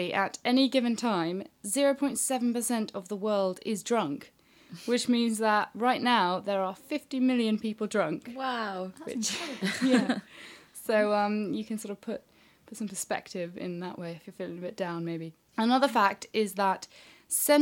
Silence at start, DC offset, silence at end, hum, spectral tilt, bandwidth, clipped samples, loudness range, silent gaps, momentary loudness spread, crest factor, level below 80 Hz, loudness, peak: 0 s; under 0.1%; 0 s; none; -3.5 dB/octave; 17.5 kHz; under 0.1%; 7 LU; none; 14 LU; 20 dB; -76 dBFS; -29 LUFS; -10 dBFS